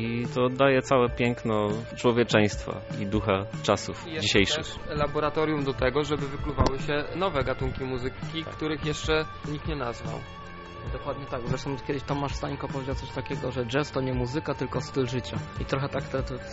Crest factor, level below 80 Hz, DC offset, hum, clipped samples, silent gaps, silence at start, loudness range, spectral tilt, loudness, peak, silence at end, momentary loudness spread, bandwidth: 22 dB; -42 dBFS; under 0.1%; none; under 0.1%; none; 0 s; 7 LU; -4.5 dB/octave; -28 LUFS; -6 dBFS; 0 s; 11 LU; 8 kHz